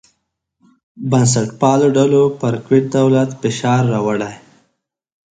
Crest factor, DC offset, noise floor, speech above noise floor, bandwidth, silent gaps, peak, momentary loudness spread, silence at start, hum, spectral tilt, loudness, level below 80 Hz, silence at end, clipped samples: 16 dB; under 0.1%; -71 dBFS; 56 dB; 9.4 kHz; none; 0 dBFS; 8 LU; 0.95 s; none; -6 dB/octave; -15 LUFS; -54 dBFS; 0.95 s; under 0.1%